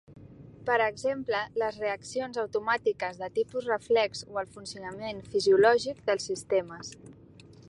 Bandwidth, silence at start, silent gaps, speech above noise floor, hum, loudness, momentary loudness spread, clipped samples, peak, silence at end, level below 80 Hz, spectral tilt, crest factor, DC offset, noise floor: 11.5 kHz; 0.1 s; none; 24 dB; none; -29 LUFS; 15 LU; under 0.1%; -10 dBFS; 0.55 s; -64 dBFS; -4 dB/octave; 20 dB; under 0.1%; -52 dBFS